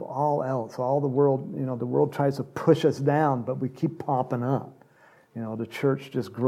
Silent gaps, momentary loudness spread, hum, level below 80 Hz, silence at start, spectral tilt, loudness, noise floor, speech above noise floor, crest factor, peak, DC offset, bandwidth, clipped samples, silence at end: none; 10 LU; none; -72 dBFS; 0 s; -8 dB/octave; -26 LUFS; -57 dBFS; 32 dB; 18 dB; -8 dBFS; under 0.1%; 13.5 kHz; under 0.1%; 0 s